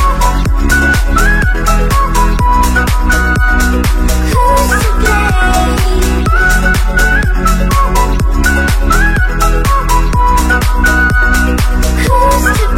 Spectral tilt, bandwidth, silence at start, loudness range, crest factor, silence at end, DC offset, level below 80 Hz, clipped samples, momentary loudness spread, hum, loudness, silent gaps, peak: -4.5 dB/octave; 16.5 kHz; 0 s; 1 LU; 8 dB; 0 s; 0.4%; -10 dBFS; under 0.1%; 3 LU; none; -11 LUFS; none; 0 dBFS